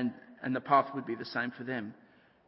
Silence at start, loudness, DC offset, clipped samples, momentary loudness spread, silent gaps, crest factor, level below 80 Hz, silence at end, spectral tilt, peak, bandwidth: 0 s; -33 LUFS; under 0.1%; under 0.1%; 12 LU; none; 22 dB; -78 dBFS; 0.55 s; -4 dB/octave; -12 dBFS; 5.6 kHz